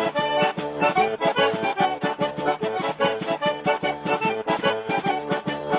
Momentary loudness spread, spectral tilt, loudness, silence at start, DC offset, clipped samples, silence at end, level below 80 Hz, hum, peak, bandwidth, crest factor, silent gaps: 4 LU; -9 dB/octave; -24 LUFS; 0 s; under 0.1%; under 0.1%; 0 s; -62 dBFS; none; -6 dBFS; 4 kHz; 18 dB; none